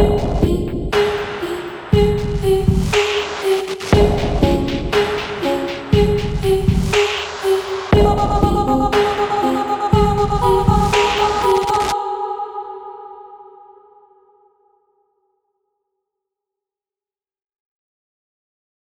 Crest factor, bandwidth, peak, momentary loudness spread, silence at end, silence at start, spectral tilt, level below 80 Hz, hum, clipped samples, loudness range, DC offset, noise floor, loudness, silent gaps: 18 dB; 17 kHz; 0 dBFS; 9 LU; 5.55 s; 0 s; -6 dB/octave; -28 dBFS; none; under 0.1%; 6 LU; under 0.1%; under -90 dBFS; -17 LUFS; none